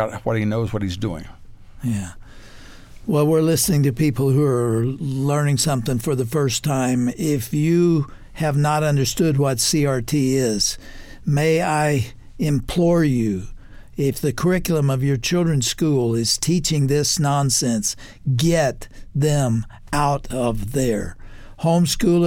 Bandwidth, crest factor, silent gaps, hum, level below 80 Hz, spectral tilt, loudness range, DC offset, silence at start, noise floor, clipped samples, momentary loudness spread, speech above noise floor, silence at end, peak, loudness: 17 kHz; 14 dB; none; none; -38 dBFS; -5 dB/octave; 3 LU; under 0.1%; 0 s; -40 dBFS; under 0.1%; 8 LU; 21 dB; 0 s; -6 dBFS; -20 LUFS